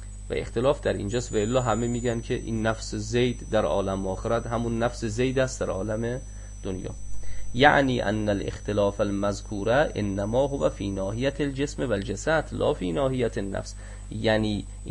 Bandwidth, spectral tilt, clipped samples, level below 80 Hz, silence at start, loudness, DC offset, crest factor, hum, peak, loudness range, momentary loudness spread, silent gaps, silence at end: 11 kHz; -5.5 dB/octave; under 0.1%; -38 dBFS; 0 s; -26 LUFS; under 0.1%; 22 dB; none; -4 dBFS; 3 LU; 10 LU; none; 0 s